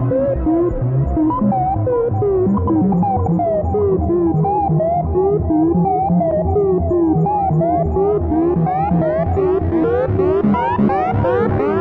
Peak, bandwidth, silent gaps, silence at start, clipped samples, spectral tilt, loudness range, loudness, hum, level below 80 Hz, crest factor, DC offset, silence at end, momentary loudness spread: -4 dBFS; 4.1 kHz; none; 0 s; under 0.1%; -12 dB/octave; 1 LU; -16 LUFS; none; -32 dBFS; 12 dB; under 0.1%; 0 s; 2 LU